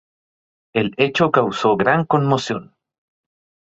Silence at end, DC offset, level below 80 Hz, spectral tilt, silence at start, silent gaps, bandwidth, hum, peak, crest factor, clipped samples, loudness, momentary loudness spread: 1.15 s; under 0.1%; -58 dBFS; -6 dB/octave; 0.75 s; none; 8 kHz; none; -2 dBFS; 18 dB; under 0.1%; -18 LUFS; 9 LU